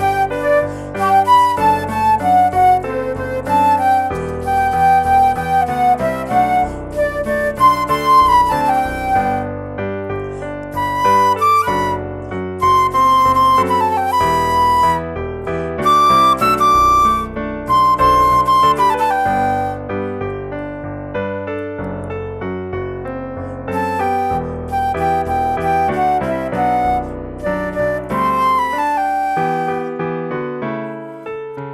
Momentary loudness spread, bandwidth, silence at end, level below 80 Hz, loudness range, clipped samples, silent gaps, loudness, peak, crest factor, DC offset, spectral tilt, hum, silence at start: 13 LU; 16 kHz; 0 s; -36 dBFS; 8 LU; under 0.1%; none; -16 LUFS; -2 dBFS; 14 dB; under 0.1%; -5.5 dB/octave; none; 0 s